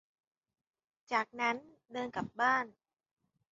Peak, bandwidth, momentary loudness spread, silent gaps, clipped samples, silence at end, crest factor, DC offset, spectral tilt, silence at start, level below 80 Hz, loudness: -18 dBFS; 7.6 kHz; 12 LU; none; under 0.1%; 0.8 s; 22 dB; under 0.1%; -1.5 dB/octave; 1.1 s; -76 dBFS; -34 LUFS